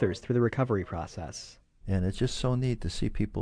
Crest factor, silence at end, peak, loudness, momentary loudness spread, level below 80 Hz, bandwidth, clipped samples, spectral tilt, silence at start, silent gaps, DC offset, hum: 16 dB; 0 s; -12 dBFS; -30 LUFS; 13 LU; -42 dBFS; 10.5 kHz; under 0.1%; -6.5 dB/octave; 0 s; none; under 0.1%; none